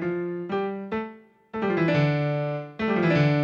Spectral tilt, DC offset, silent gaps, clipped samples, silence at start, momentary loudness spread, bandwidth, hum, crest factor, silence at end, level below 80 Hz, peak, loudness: -8.5 dB/octave; under 0.1%; none; under 0.1%; 0 s; 11 LU; 6.8 kHz; none; 14 dB; 0 s; -58 dBFS; -10 dBFS; -26 LUFS